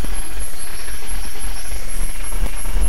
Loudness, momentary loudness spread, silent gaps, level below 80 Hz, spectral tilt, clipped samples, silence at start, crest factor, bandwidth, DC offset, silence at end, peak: -28 LUFS; 3 LU; none; -24 dBFS; -3 dB/octave; under 0.1%; 0 s; 14 dB; 16 kHz; 30%; 0 s; -4 dBFS